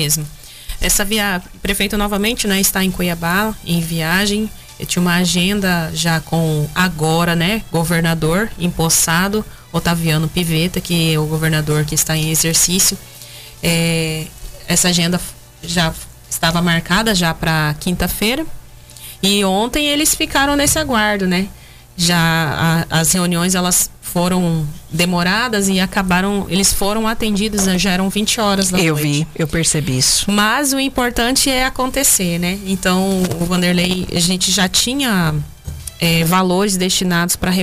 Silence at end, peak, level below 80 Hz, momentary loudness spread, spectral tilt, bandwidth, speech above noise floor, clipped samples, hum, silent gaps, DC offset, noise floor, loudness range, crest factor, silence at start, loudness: 0 s; -2 dBFS; -34 dBFS; 8 LU; -3.5 dB/octave; 16 kHz; 20 dB; under 0.1%; none; none; under 0.1%; -36 dBFS; 2 LU; 14 dB; 0 s; -15 LUFS